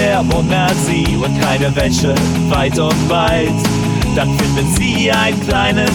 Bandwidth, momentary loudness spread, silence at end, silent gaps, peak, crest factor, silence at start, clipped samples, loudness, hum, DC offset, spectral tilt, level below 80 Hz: over 20 kHz; 2 LU; 0 s; none; -2 dBFS; 12 dB; 0 s; under 0.1%; -14 LUFS; none; under 0.1%; -5 dB/octave; -28 dBFS